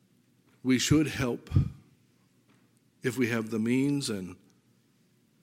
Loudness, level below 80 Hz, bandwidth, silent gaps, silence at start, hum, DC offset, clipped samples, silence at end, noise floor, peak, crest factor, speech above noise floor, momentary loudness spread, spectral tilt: -29 LUFS; -52 dBFS; 16.5 kHz; none; 0.65 s; none; under 0.1%; under 0.1%; 1.1 s; -67 dBFS; -10 dBFS; 20 dB; 39 dB; 11 LU; -5.5 dB/octave